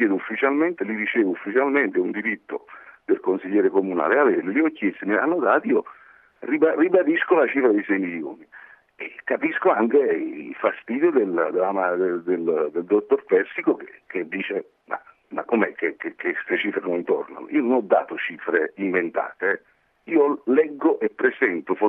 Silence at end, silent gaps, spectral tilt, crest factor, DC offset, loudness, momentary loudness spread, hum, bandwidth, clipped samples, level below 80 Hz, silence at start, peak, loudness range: 0 s; none; -9 dB/octave; 18 dB; under 0.1%; -22 LUFS; 11 LU; none; 3.8 kHz; under 0.1%; -78 dBFS; 0 s; -4 dBFS; 4 LU